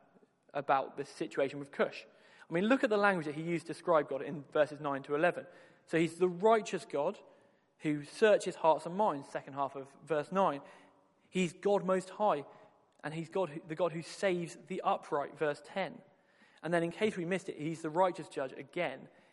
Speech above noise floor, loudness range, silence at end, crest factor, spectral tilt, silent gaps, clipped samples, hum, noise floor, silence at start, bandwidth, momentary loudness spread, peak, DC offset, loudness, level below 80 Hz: 33 dB; 4 LU; 0.25 s; 22 dB; -5.5 dB/octave; none; under 0.1%; none; -67 dBFS; 0.55 s; 11.5 kHz; 12 LU; -12 dBFS; under 0.1%; -34 LUFS; -82 dBFS